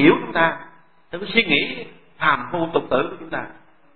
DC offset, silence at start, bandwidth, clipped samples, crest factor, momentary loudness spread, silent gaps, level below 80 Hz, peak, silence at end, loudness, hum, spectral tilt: 0.9%; 0 s; 4.5 kHz; under 0.1%; 20 dB; 18 LU; none; -56 dBFS; -2 dBFS; 0 s; -20 LUFS; none; -10 dB/octave